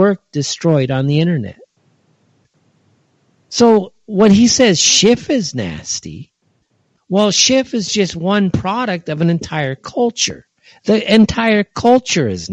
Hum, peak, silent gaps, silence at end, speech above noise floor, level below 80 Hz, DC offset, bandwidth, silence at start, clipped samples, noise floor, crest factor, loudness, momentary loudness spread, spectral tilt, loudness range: none; 0 dBFS; none; 0 s; 48 dB; -46 dBFS; under 0.1%; 9.2 kHz; 0 s; under 0.1%; -62 dBFS; 16 dB; -14 LUFS; 12 LU; -4 dB/octave; 6 LU